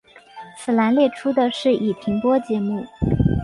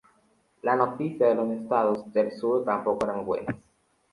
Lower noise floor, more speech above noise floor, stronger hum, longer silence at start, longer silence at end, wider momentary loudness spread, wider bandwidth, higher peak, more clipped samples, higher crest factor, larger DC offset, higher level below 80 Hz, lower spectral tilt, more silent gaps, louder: second, -41 dBFS vs -66 dBFS; second, 22 dB vs 40 dB; neither; second, 0.35 s vs 0.65 s; second, 0 s vs 0.55 s; about the same, 9 LU vs 7 LU; about the same, 11.5 kHz vs 11.5 kHz; about the same, -6 dBFS vs -8 dBFS; neither; about the same, 16 dB vs 18 dB; neither; first, -36 dBFS vs -64 dBFS; about the same, -7.5 dB/octave vs -8 dB/octave; neither; first, -20 LUFS vs -26 LUFS